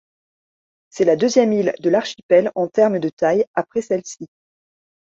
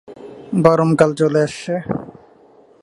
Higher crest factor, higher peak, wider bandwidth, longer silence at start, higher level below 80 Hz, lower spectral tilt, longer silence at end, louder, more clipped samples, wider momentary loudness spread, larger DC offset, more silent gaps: about the same, 18 dB vs 18 dB; about the same, -2 dBFS vs 0 dBFS; second, 7.8 kHz vs 11.5 kHz; first, 0.95 s vs 0.1 s; second, -64 dBFS vs -54 dBFS; second, -5.5 dB/octave vs -7 dB/octave; first, 0.9 s vs 0.75 s; about the same, -18 LUFS vs -17 LUFS; neither; second, 8 LU vs 14 LU; neither; first, 2.23-2.29 s, 3.13-3.17 s, 3.47-3.54 s vs none